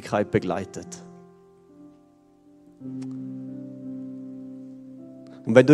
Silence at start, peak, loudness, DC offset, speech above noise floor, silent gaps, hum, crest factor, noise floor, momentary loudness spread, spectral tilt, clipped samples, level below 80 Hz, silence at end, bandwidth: 0 s; 0 dBFS; -28 LUFS; under 0.1%; 35 dB; none; none; 26 dB; -57 dBFS; 20 LU; -7 dB/octave; under 0.1%; -62 dBFS; 0 s; 11.5 kHz